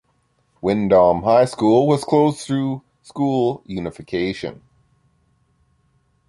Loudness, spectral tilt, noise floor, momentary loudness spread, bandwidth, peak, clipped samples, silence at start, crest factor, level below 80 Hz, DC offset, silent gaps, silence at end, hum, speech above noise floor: -19 LUFS; -7 dB/octave; -64 dBFS; 14 LU; 11.5 kHz; -2 dBFS; under 0.1%; 0.65 s; 18 dB; -50 dBFS; under 0.1%; none; 1.75 s; none; 47 dB